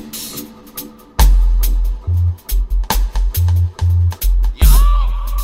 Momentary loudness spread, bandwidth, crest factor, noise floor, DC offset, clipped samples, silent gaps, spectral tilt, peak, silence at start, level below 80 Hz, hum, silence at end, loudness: 14 LU; 16.5 kHz; 14 dB; -33 dBFS; under 0.1%; under 0.1%; none; -4.5 dB/octave; 0 dBFS; 0 s; -14 dBFS; none; 0 s; -17 LUFS